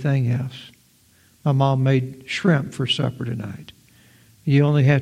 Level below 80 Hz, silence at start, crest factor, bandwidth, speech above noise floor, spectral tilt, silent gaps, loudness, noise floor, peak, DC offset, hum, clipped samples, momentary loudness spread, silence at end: -58 dBFS; 0 s; 18 dB; 9.6 kHz; 37 dB; -7 dB/octave; none; -21 LUFS; -57 dBFS; -2 dBFS; under 0.1%; none; under 0.1%; 14 LU; 0 s